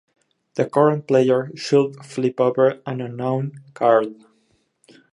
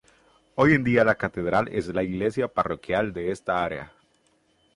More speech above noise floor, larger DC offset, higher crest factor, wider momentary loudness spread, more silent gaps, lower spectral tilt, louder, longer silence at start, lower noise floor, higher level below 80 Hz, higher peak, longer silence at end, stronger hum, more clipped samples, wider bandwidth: about the same, 45 dB vs 42 dB; neither; about the same, 18 dB vs 20 dB; about the same, 11 LU vs 9 LU; neither; about the same, -7 dB/octave vs -7 dB/octave; first, -20 LUFS vs -24 LUFS; about the same, 0.55 s vs 0.55 s; about the same, -64 dBFS vs -65 dBFS; second, -70 dBFS vs -52 dBFS; first, -2 dBFS vs -6 dBFS; about the same, 1 s vs 0.9 s; neither; neither; about the same, 11 kHz vs 11.5 kHz